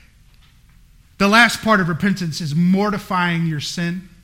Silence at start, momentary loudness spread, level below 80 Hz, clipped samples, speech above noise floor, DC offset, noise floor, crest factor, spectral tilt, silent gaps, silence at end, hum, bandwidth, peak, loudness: 1.2 s; 11 LU; -48 dBFS; under 0.1%; 32 dB; under 0.1%; -50 dBFS; 20 dB; -5 dB/octave; none; 0.15 s; none; 16.5 kHz; 0 dBFS; -17 LUFS